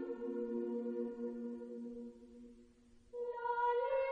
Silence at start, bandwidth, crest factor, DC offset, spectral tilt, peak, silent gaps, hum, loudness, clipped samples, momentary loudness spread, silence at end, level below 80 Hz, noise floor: 0 s; 7.2 kHz; 14 dB; under 0.1%; -7 dB/octave; -26 dBFS; none; none; -41 LUFS; under 0.1%; 20 LU; 0 s; -72 dBFS; -65 dBFS